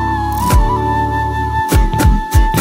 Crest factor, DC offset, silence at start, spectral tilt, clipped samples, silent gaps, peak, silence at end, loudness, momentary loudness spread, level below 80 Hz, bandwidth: 12 dB; under 0.1%; 0 s; -5.5 dB/octave; under 0.1%; none; 0 dBFS; 0 s; -14 LUFS; 4 LU; -16 dBFS; 16.5 kHz